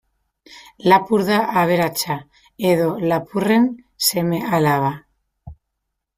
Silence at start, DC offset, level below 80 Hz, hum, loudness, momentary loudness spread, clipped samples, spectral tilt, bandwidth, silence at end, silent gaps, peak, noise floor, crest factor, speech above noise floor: 0.5 s; under 0.1%; -56 dBFS; none; -18 LUFS; 8 LU; under 0.1%; -5 dB/octave; 16 kHz; 0.65 s; none; -2 dBFS; -78 dBFS; 18 dB; 60 dB